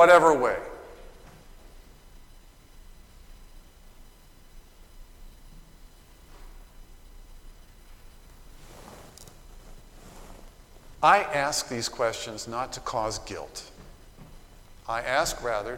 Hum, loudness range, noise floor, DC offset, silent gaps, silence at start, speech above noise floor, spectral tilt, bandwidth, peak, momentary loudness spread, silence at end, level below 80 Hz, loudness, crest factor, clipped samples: none; 24 LU; -51 dBFS; under 0.1%; none; 0 s; 27 dB; -3 dB/octave; 18.5 kHz; -6 dBFS; 28 LU; 0 s; -48 dBFS; -25 LUFS; 24 dB; under 0.1%